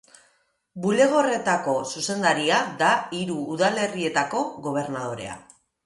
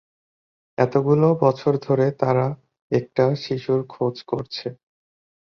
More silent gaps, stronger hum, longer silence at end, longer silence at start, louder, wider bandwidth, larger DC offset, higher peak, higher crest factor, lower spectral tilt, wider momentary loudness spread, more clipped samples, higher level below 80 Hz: second, none vs 2.82-2.90 s; neither; second, 0.45 s vs 0.85 s; about the same, 0.75 s vs 0.8 s; about the same, -23 LUFS vs -22 LUFS; first, 11.5 kHz vs 6.8 kHz; neither; about the same, -6 dBFS vs -4 dBFS; about the same, 18 dB vs 18 dB; second, -4 dB/octave vs -8.5 dB/octave; about the same, 11 LU vs 12 LU; neither; second, -66 dBFS vs -60 dBFS